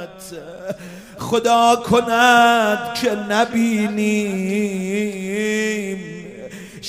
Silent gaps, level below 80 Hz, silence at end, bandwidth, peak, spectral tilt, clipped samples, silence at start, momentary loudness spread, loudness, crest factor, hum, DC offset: none; -54 dBFS; 0 s; 15.5 kHz; 0 dBFS; -4 dB/octave; under 0.1%; 0 s; 20 LU; -17 LUFS; 18 dB; none; under 0.1%